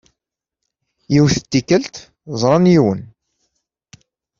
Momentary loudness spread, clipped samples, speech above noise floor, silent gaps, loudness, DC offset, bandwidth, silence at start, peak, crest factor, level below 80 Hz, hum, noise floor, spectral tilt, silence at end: 17 LU; under 0.1%; 67 dB; none; -15 LUFS; under 0.1%; 7.6 kHz; 1.1 s; 0 dBFS; 18 dB; -48 dBFS; none; -82 dBFS; -6 dB/octave; 1.35 s